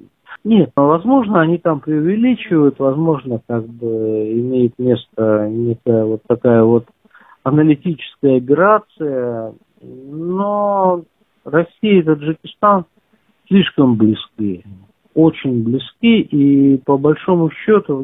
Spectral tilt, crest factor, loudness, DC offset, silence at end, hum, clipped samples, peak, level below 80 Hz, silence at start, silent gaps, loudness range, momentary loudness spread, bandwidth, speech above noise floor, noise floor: -11 dB/octave; 14 dB; -15 LUFS; under 0.1%; 0 s; none; under 0.1%; 0 dBFS; -54 dBFS; 0.3 s; none; 3 LU; 10 LU; 4 kHz; 44 dB; -58 dBFS